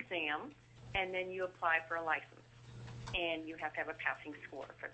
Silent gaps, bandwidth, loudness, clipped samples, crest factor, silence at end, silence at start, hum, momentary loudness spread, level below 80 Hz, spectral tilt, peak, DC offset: none; 8.2 kHz; -38 LUFS; under 0.1%; 22 dB; 0 s; 0 s; none; 18 LU; -62 dBFS; -5 dB/octave; -18 dBFS; under 0.1%